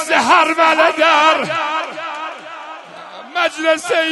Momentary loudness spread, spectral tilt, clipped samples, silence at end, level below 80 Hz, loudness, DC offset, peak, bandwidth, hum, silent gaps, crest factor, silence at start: 20 LU; -2 dB/octave; under 0.1%; 0 s; -66 dBFS; -14 LUFS; under 0.1%; 0 dBFS; 12 kHz; none; none; 16 dB; 0 s